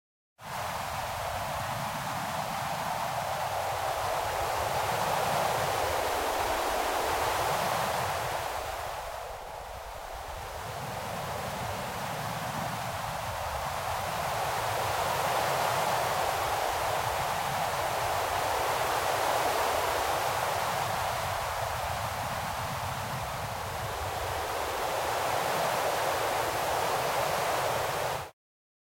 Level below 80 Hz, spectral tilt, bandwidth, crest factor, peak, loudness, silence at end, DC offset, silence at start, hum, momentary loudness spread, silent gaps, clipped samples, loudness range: -52 dBFS; -3 dB/octave; 16.5 kHz; 16 dB; -16 dBFS; -31 LUFS; 0.5 s; under 0.1%; 0.4 s; none; 7 LU; none; under 0.1%; 6 LU